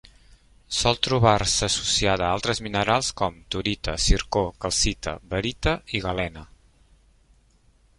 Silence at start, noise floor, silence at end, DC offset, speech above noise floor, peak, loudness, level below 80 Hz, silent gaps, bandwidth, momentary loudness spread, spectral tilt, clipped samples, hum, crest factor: 0.7 s; -59 dBFS; 1.55 s; under 0.1%; 36 dB; -4 dBFS; -24 LUFS; -36 dBFS; none; 11.5 kHz; 9 LU; -3.5 dB/octave; under 0.1%; none; 22 dB